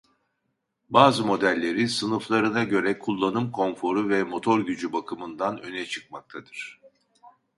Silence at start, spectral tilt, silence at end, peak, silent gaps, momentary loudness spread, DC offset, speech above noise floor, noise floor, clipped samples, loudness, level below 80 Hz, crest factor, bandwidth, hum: 0.9 s; -5 dB/octave; 0.3 s; -2 dBFS; none; 17 LU; under 0.1%; 53 dB; -77 dBFS; under 0.1%; -24 LUFS; -66 dBFS; 24 dB; 11.5 kHz; none